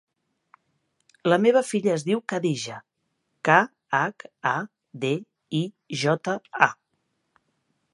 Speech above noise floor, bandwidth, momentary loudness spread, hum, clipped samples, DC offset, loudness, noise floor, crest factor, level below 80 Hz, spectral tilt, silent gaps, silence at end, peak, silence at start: 52 dB; 11.5 kHz; 11 LU; none; under 0.1%; under 0.1%; -24 LUFS; -76 dBFS; 26 dB; -76 dBFS; -5 dB/octave; none; 1.2 s; 0 dBFS; 1.25 s